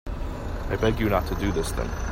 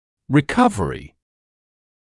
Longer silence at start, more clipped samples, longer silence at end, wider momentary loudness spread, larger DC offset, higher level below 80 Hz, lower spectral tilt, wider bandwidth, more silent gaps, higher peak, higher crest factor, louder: second, 0.05 s vs 0.3 s; neither; second, 0 s vs 1.05 s; about the same, 10 LU vs 11 LU; neither; first, -32 dBFS vs -46 dBFS; about the same, -6 dB/octave vs -6.5 dB/octave; first, 16 kHz vs 12 kHz; neither; second, -8 dBFS vs -4 dBFS; about the same, 18 dB vs 20 dB; second, -27 LUFS vs -19 LUFS